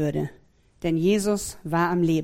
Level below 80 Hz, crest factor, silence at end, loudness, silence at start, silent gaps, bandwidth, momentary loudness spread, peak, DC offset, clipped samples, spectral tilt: -50 dBFS; 16 dB; 0 s; -25 LUFS; 0 s; none; 16.5 kHz; 9 LU; -10 dBFS; under 0.1%; under 0.1%; -6 dB/octave